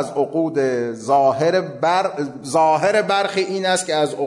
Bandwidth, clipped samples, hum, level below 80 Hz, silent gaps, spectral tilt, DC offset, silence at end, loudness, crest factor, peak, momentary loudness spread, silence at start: 11.5 kHz; under 0.1%; none; -68 dBFS; none; -4 dB/octave; under 0.1%; 0 s; -19 LUFS; 12 dB; -6 dBFS; 6 LU; 0 s